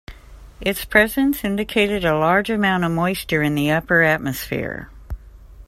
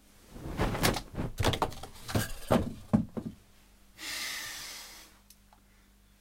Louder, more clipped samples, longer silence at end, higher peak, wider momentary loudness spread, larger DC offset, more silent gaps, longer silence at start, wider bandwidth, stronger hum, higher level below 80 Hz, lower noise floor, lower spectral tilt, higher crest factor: first, -19 LUFS vs -33 LUFS; neither; second, 0.05 s vs 1.1 s; first, 0 dBFS vs -10 dBFS; about the same, 14 LU vs 16 LU; neither; neither; second, 0.1 s vs 0.3 s; about the same, 16 kHz vs 16.5 kHz; second, none vs 50 Hz at -55 dBFS; about the same, -40 dBFS vs -44 dBFS; second, -42 dBFS vs -61 dBFS; about the same, -5.5 dB/octave vs -4.5 dB/octave; about the same, 20 dB vs 24 dB